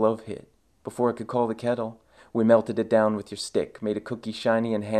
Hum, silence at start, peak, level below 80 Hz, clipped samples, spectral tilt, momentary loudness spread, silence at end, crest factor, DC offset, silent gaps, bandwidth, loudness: none; 0 s; -4 dBFS; -64 dBFS; under 0.1%; -6 dB/octave; 14 LU; 0 s; 20 dB; under 0.1%; none; 12.5 kHz; -26 LUFS